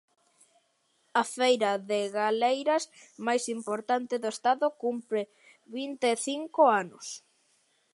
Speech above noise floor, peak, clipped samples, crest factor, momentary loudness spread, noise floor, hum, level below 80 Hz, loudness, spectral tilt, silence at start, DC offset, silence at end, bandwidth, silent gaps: 44 dB; -10 dBFS; under 0.1%; 20 dB; 14 LU; -72 dBFS; none; -86 dBFS; -28 LUFS; -3 dB/octave; 1.15 s; under 0.1%; 0.75 s; 11.5 kHz; none